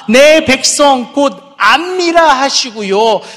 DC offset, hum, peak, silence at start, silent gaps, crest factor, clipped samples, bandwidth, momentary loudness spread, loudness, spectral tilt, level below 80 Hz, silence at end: under 0.1%; none; 0 dBFS; 0 s; none; 10 dB; 0.8%; 16 kHz; 8 LU; -9 LUFS; -2 dB/octave; -46 dBFS; 0 s